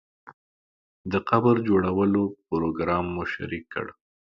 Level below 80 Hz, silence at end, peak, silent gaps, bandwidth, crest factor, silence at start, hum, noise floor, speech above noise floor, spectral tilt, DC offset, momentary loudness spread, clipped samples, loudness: -50 dBFS; 0.4 s; -4 dBFS; 0.33-1.04 s; 6.8 kHz; 20 dB; 0.25 s; none; under -90 dBFS; over 66 dB; -9 dB/octave; under 0.1%; 13 LU; under 0.1%; -25 LUFS